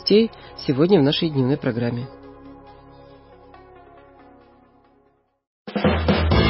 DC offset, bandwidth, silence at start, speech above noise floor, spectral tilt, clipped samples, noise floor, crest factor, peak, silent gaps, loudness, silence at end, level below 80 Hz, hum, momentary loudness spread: under 0.1%; 5.8 kHz; 0 s; 43 dB; -10 dB/octave; under 0.1%; -62 dBFS; 18 dB; -4 dBFS; 5.47-5.65 s; -20 LUFS; 0 s; -34 dBFS; none; 26 LU